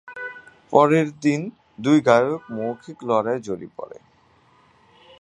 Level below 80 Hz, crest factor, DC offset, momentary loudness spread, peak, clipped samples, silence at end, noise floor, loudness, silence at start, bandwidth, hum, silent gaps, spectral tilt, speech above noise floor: -66 dBFS; 22 dB; under 0.1%; 19 LU; 0 dBFS; under 0.1%; 1.35 s; -57 dBFS; -21 LUFS; 0.05 s; 10.5 kHz; none; none; -6.5 dB/octave; 37 dB